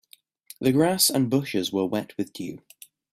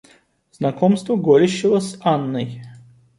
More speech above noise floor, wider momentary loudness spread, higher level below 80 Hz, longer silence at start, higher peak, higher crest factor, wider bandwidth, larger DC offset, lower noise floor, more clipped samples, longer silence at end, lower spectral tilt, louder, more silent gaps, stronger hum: second, 27 dB vs 37 dB; first, 16 LU vs 12 LU; about the same, -64 dBFS vs -62 dBFS; about the same, 0.6 s vs 0.6 s; second, -6 dBFS vs -2 dBFS; about the same, 20 dB vs 16 dB; first, 16 kHz vs 11.5 kHz; neither; second, -51 dBFS vs -55 dBFS; neither; first, 0.55 s vs 0.4 s; second, -4 dB/octave vs -6.5 dB/octave; second, -24 LUFS vs -18 LUFS; neither; neither